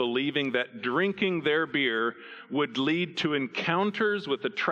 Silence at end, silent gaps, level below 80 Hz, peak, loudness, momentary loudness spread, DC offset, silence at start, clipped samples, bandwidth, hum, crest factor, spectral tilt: 0 s; none; -74 dBFS; -12 dBFS; -28 LUFS; 4 LU; under 0.1%; 0 s; under 0.1%; 8.2 kHz; none; 16 dB; -6 dB/octave